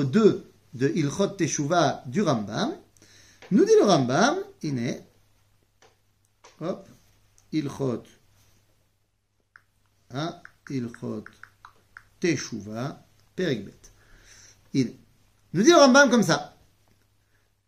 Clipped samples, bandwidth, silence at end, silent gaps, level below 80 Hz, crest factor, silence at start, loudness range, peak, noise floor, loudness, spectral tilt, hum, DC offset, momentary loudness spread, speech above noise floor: under 0.1%; 15 kHz; 1.2 s; none; -64 dBFS; 22 dB; 0 s; 15 LU; -4 dBFS; -73 dBFS; -24 LUFS; -5 dB/octave; none; under 0.1%; 18 LU; 50 dB